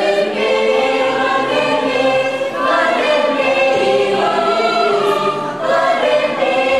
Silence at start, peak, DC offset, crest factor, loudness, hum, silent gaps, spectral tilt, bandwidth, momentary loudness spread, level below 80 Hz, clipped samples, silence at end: 0 s; -4 dBFS; 0.3%; 12 dB; -15 LUFS; none; none; -4 dB/octave; 12.5 kHz; 3 LU; -60 dBFS; under 0.1%; 0 s